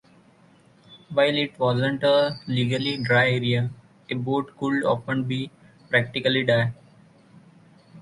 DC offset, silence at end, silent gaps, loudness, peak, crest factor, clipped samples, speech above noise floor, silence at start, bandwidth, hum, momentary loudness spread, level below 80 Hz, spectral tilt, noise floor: under 0.1%; 0 s; none; -23 LUFS; -4 dBFS; 20 dB; under 0.1%; 33 dB; 0.9 s; 11.5 kHz; none; 9 LU; -62 dBFS; -6.5 dB/octave; -56 dBFS